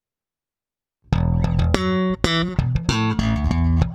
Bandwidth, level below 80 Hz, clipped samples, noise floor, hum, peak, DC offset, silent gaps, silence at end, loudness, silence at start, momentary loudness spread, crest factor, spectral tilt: 10.5 kHz; -28 dBFS; under 0.1%; under -90 dBFS; none; 0 dBFS; under 0.1%; none; 0 s; -21 LUFS; 1.1 s; 2 LU; 20 dB; -6.5 dB/octave